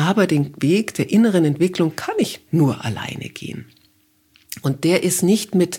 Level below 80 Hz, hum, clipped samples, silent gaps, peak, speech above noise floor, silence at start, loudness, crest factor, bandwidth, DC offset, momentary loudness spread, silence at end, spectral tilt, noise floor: -60 dBFS; none; under 0.1%; none; -2 dBFS; 41 dB; 0 s; -19 LUFS; 18 dB; 17.5 kHz; under 0.1%; 14 LU; 0 s; -5.5 dB/octave; -60 dBFS